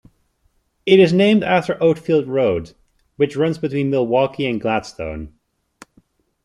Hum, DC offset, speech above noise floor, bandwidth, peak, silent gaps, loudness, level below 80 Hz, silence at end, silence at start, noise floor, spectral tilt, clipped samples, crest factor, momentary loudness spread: none; under 0.1%; 47 dB; 11 kHz; -2 dBFS; none; -18 LUFS; -50 dBFS; 1.15 s; 0.85 s; -64 dBFS; -7 dB/octave; under 0.1%; 18 dB; 16 LU